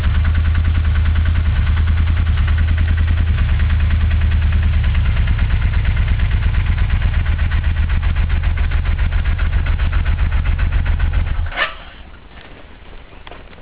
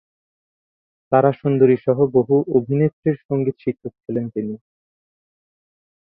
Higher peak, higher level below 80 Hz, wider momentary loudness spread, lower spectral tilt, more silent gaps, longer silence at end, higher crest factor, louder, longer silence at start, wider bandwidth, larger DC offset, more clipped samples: about the same, -4 dBFS vs -2 dBFS; first, -16 dBFS vs -60 dBFS; second, 3 LU vs 12 LU; second, -10 dB/octave vs -13 dB/octave; second, none vs 2.93-3.03 s, 3.25-3.29 s; second, 0 s vs 1.6 s; second, 10 dB vs 18 dB; about the same, -18 LUFS vs -19 LUFS; second, 0 s vs 1.1 s; about the same, 4 kHz vs 3.8 kHz; first, 0.7% vs under 0.1%; neither